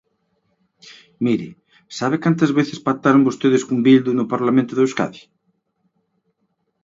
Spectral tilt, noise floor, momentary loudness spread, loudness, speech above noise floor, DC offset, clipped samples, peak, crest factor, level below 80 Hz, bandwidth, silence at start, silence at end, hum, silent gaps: -6.5 dB/octave; -70 dBFS; 10 LU; -18 LUFS; 53 dB; under 0.1%; under 0.1%; -2 dBFS; 18 dB; -64 dBFS; 7.8 kHz; 0.85 s; 1.65 s; none; none